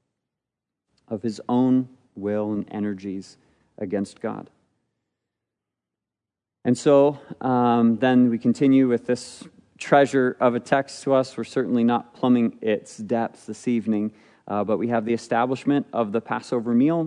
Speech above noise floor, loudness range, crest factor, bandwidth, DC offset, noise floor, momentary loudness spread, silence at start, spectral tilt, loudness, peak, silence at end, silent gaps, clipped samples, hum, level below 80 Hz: 66 dB; 11 LU; 18 dB; 10.5 kHz; under 0.1%; -88 dBFS; 13 LU; 1.1 s; -6.5 dB/octave; -23 LUFS; -4 dBFS; 0 s; none; under 0.1%; none; -74 dBFS